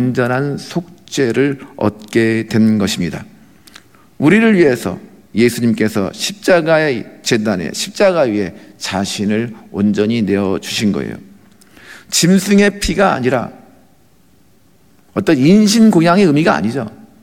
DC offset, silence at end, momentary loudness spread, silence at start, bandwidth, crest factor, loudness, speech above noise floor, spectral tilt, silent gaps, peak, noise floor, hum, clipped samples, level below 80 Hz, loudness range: 0.3%; 0.3 s; 14 LU; 0 s; 16.5 kHz; 14 dB; -14 LUFS; 38 dB; -5 dB/octave; none; 0 dBFS; -52 dBFS; none; under 0.1%; -44 dBFS; 3 LU